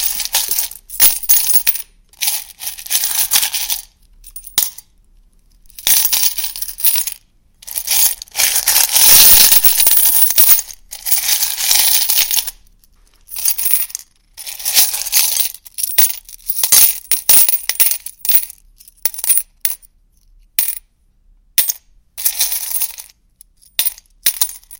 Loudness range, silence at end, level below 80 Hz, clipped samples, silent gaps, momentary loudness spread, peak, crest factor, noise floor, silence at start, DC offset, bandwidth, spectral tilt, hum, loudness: 11 LU; 0.05 s; -46 dBFS; 0.3%; none; 15 LU; 0 dBFS; 16 dB; -53 dBFS; 0 s; under 0.1%; over 20 kHz; 2.5 dB/octave; none; -11 LUFS